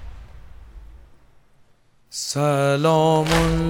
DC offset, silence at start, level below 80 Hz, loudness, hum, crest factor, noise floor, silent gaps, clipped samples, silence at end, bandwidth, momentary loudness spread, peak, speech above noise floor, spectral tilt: under 0.1%; 0 s; -36 dBFS; -19 LUFS; none; 18 dB; -56 dBFS; none; under 0.1%; 0 s; 16.5 kHz; 14 LU; -4 dBFS; 38 dB; -5.5 dB/octave